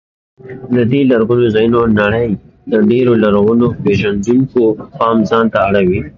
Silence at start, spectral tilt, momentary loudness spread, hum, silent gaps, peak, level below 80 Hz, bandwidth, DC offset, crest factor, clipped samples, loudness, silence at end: 0.45 s; -8 dB/octave; 6 LU; none; none; 0 dBFS; -38 dBFS; 7.4 kHz; under 0.1%; 12 dB; under 0.1%; -12 LUFS; 0.1 s